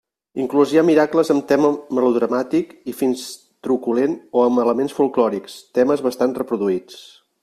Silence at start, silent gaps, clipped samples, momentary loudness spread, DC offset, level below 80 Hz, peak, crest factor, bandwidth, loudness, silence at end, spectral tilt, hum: 0.35 s; none; under 0.1%; 11 LU; under 0.1%; -64 dBFS; -2 dBFS; 16 dB; 14.5 kHz; -19 LUFS; 0.4 s; -6 dB/octave; none